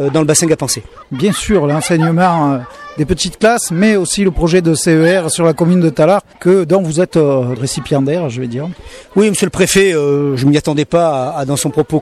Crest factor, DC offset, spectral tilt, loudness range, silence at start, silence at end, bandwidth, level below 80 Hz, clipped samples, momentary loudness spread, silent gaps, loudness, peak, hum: 12 dB; under 0.1%; -5 dB/octave; 2 LU; 0 s; 0 s; 14 kHz; -36 dBFS; under 0.1%; 8 LU; none; -13 LUFS; -2 dBFS; none